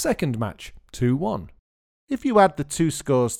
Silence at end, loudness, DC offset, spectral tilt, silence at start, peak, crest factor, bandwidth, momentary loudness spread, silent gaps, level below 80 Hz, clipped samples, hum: 0 s; -23 LUFS; under 0.1%; -5.5 dB/octave; 0 s; -4 dBFS; 20 dB; 17.5 kHz; 14 LU; 1.59-2.08 s; -48 dBFS; under 0.1%; none